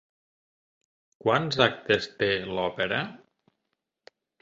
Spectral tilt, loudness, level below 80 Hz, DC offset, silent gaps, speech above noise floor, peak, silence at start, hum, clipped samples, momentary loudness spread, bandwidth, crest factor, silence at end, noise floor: -5 dB/octave; -26 LUFS; -62 dBFS; under 0.1%; none; 55 dB; -2 dBFS; 1.25 s; none; under 0.1%; 8 LU; 7.8 kHz; 26 dB; 1.25 s; -81 dBFS